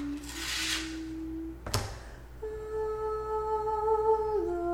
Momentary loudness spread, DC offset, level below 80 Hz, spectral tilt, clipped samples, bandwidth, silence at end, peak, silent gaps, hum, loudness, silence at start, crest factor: 13 LU; under 0.1%; -46 dBFS; -4 dB/octave; under 0.1%; 17 kHz; 0 s; -6 dBFS; none; none; -32 LUFS; 0 s; 26 dB